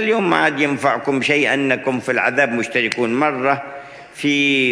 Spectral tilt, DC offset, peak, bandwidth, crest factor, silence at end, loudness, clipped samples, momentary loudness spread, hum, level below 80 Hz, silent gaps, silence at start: -4.5 dB/octave; under 0.1%; 0 dBFS; 11 kHz; 18 dB; 0 s; -17 LUFS; under 0.1%; 7 LU; none; -64 dBFS; none; 0 s